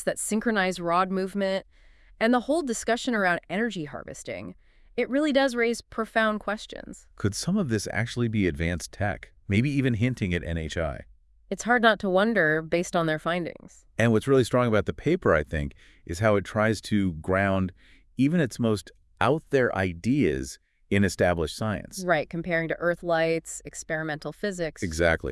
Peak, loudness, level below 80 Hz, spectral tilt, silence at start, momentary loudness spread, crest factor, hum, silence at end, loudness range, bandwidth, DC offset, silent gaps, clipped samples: -4 dBFS; -26 LUFS; -48 dBFS; -5.5 dB/octave; 0 s; 12 LU; 22 dB; none; 0 s; 3 LU; 12 kHz; under 0.1%; none; under 0.1%